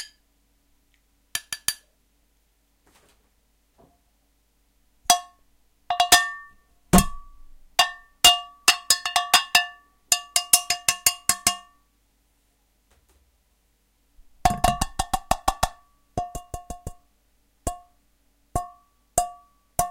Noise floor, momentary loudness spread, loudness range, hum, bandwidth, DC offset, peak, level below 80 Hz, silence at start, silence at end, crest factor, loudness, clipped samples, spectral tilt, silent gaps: -66 dBFS; 19 LU; 16 LU; none; 17 kHz; under 0.1%; -2 dBFS; -40 dBFS; 0 s; 0 s; 26 dB; -22 LUFS; under 0.1%; -1.5 dB/octave; none